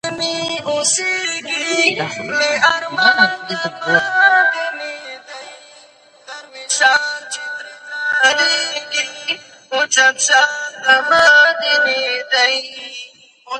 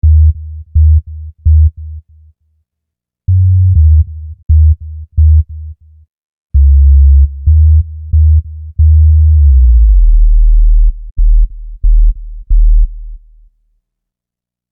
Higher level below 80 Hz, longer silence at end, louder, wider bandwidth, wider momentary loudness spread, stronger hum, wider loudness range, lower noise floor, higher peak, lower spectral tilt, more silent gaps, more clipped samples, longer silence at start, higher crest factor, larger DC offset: second, -64 dBFS vs -10 dBFS; second, 0 s vs 1.55 s; second, -14 LUFS vs -10 LUFS; first, 11.5 kHz vs 0.3 kHz; first, 18 LU vs 13 LU; second, none vs 60 Hz at -55 dBFS; about the same, 6 LU vs 6 LU; second, -47 dBFS vs -84 dBFS; about the same, 0 dBFS vs 0 dBFS; second, -0.5 dB/octave vs -15 dB/octave; second, none vs 4.43-4.49 s, 6.10-6.50 s, 11.11-11.16 s; neither; about the same, 0.05 s vs 0.05 s; first, 16 dB vs 8 dB; neither